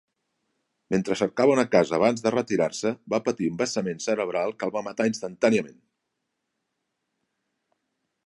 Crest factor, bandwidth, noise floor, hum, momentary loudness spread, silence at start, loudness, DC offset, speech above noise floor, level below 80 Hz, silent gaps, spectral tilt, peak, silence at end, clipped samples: 22 dB; 11.5 kHz; -80 dBFS; none; 7 LU; 0.9 s; -25 LUFS; under 0.1%; 56 dB; -66 dBFS; none; -5 dB/octave; -4 dBFS; 2.55 s; under 0.1%